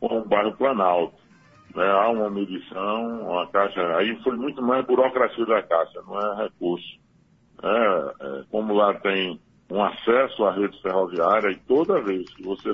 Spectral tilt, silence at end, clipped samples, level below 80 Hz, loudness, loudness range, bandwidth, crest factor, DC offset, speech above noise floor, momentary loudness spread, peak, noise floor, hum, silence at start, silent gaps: -7.5 dB/octave; 0 s; under 0.1%; -64 dBFS; -23 LUFS; 2 LU; 6 kHz; 18 dB; under 0.1%; 36 dB; 10 LU; -6 dBFS; -59 dBFS; none; 0 s; none